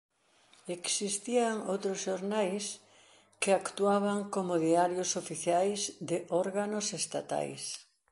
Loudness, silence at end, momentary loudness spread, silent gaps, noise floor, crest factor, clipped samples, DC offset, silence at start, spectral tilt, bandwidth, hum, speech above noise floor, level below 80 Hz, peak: -32 LUFS; 0.3 s; 9 LU; none; -65 dBFS; 18 dB; under 0.1%; under 0.1%; 0.65 s; -3.5 dB/octave; 11.5 kHz; none; 33 dB; -80 dBFS; -14 dBFS